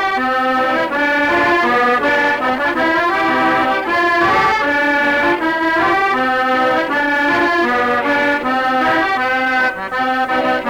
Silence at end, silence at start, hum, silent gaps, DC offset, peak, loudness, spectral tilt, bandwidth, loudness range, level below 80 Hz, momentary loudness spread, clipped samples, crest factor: 0 s; 0 s; none; none; under 0.1%; -4 dBFS; -14 LUFS; -4.5 dB/octave; 18 kHz; 1 LU; -48 dBFS; 3 LU; under 0.1%; 10 dB